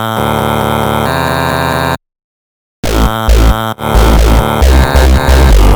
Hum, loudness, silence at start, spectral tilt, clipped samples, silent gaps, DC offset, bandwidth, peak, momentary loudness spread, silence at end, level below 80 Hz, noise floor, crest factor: none; -10 LUFS; 0 s; -5.5 dB/octave; 0.8%; 2.24-2.83 s; under 0.1%; over 20 kHz; 0 dBFS; 6 LU; 0 s; -10 dBFS; under -90 dBFS; 8 dB